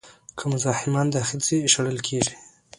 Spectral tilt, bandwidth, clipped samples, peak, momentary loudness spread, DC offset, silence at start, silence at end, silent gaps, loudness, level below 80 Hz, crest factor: -3.5 dB/octave; 11.5 kHz; under 0.1%; -4 dBFS; 9 LU; under 0.1%; 0.05 s; 0.35 s; none; -23 LUFS; -58 dBFS; 20 dB